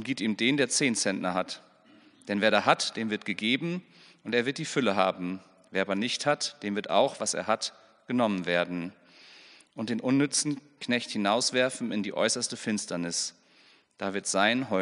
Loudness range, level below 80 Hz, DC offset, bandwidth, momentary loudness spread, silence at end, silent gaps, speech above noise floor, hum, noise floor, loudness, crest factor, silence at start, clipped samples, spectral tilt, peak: 2 LU; -78 dBFS; under 0.1%; 10.5 kHz; 11 LU; 0 s; none; 32 dB; none; -61 dBFS; -28 LUFS; 24 dB; 0 s; under 0.1%; -3 dB/octave; -6 dBFS